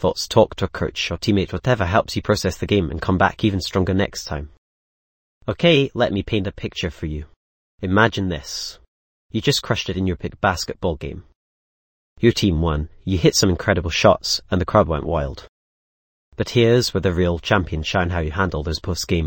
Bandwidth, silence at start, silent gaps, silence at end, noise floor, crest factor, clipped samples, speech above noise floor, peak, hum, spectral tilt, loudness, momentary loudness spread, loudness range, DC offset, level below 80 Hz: 17 kHz; 0 s; 4.58-5.41 s, 7.36-7.78 s, 8.88-9.29 s, 11.35-12.16 s, 15.49-16.32 s; 0 s; under -90 dBFS; 20 dB; under 0.1%; over 70 dB; 0 dBFS; none; -5 dB/octave; -20 LUFS; 12 LU; 4 LU; under 0.1%; -36 dBFS